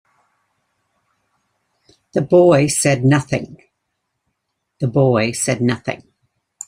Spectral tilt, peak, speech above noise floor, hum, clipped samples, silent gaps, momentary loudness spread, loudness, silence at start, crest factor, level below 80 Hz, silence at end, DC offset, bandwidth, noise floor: -5.5 dB/octave; -2 dBFS; 59 dB; none; under 0.1%; none; 13 LU; -16 LUFS; 2.15 s; 18 dB; -54 dBFS; 0.7 s; under 0.1%; 16 kHz; -74 dBFS